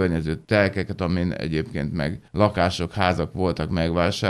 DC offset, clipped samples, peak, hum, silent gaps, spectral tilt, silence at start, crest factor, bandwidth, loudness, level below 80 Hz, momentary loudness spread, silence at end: under 0.1%; under 0.1%; -2 dBFS; none; none; -6.5 dB/octave; 0 s; 20 dB; 12.5 kHz; -24 LUFS; -40 dBFS; 6 LU; 0 s